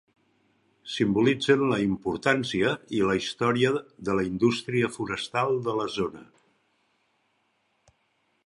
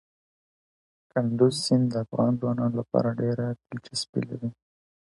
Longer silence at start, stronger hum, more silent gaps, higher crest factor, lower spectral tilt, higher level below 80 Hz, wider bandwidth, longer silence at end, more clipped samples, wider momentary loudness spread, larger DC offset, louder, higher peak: second, 0.85 s vs 1.15 s; neither; second, none vs 4.09-4.13 s; about the same, 22 dB vs 20 dB; about the same, -5.5 dB/octave vs -6.5 dB/octave; first, -58 dBFS vs -64 dBFS; about the same, 11.5 kHz vs 11.5 kHz; first, 2.2 s vs 0.5 s; neither; about the same, 8 LU vs 10 LU; neither; about the same, -26 LUFS vs -27 LUFS; about the same, -6 dBFS vs -8 dBFS